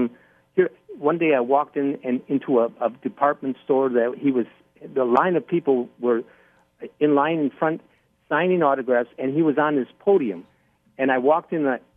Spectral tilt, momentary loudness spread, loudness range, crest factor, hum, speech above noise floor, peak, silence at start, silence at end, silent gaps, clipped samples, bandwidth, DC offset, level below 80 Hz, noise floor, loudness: -9.5 dB/octave; 8 LU; 2 LU; 18 dB; none; 27 dB; -4 dBFS; 0 s; 0.2 s; none; under 0.1%; 3.7 kHz; under 0.1%; -74 dBFS; -48 dBFS; -22 LUFS